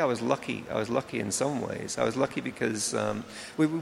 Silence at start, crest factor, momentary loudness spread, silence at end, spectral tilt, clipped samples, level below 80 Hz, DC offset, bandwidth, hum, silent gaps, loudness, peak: 0 s; 20 dB; 5 LU; 0 s; -4.5 dB/octave; under 0.1%; -64 dBFS; under 0.1%; 15.5 kHz; none; none; -30 LUFS; -8 dBFS